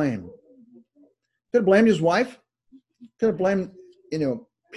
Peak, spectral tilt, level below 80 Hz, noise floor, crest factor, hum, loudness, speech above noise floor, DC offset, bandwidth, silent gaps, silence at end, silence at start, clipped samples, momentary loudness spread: -6 dBFS; -6.5 dB/octave; -62 dBFS; -64 dBFS; 20 dB; none; -23 LUFS; 43 dB; under 0.1%; 11 kHz; none; 0 s; 0 s; under 0.1%; 16 LU